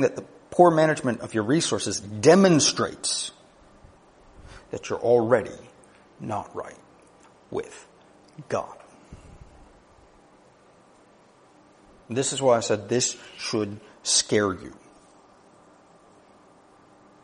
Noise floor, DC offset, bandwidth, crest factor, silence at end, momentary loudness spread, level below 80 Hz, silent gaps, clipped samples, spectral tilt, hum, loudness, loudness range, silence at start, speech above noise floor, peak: -56 dBFS; under 0.1%; 10.5 kHz; 24 dB; 2.5 s; 20 LU; -60 dBFS; none; under 0.1%; -4 dB/octave; none; -23 LUFS; 16 LU; 0 s; 33 dB; -2 dBFS